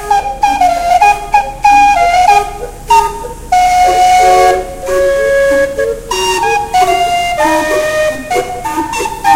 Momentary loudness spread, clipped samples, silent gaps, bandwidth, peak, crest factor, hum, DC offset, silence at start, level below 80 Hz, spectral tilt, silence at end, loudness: 9 LU; 0.2%; none; 16.5 kHz; 0 dBFS; 10 dB; none; under 0.1%; 0 s; -30 dBFS; -3 dB/octave; 0 s; -10 LUFS